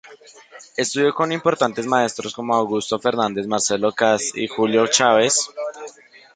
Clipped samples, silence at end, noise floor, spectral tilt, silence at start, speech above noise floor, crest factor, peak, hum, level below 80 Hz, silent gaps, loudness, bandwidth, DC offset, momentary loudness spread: under 0.1%; 0.45 s; -43 dBFS; -2.5 dB/octave; 0.05 s; 23 dB; 18 dB; -2 dBFS; none; -62 dBFS; none; -19 LUFS; 9.6 kHz; under 0.1%; 12 LU